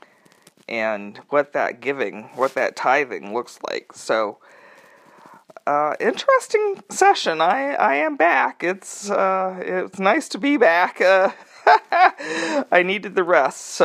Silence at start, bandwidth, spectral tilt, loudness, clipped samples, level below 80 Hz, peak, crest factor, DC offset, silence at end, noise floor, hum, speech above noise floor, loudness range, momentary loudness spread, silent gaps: 0.7 s; 14 kHz; -3.5 dB/octave; -20 LUFS; under 0.1%; -80 dBFS; 0 dBFS; 20 dB; under 0.1%; 0 s; -54 dBFS; none; 34 dB; 7 LU; 12 LU; none